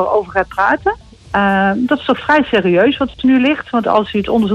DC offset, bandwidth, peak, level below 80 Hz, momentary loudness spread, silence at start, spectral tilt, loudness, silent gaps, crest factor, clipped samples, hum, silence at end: under 0.1%; 8.6 kHz; -2 dBFS; -42 dBFS; 5 LU; 0 s; -7 dB/octave; -14 LUFS; none; 12 dB; under 0.1%; none; 0 s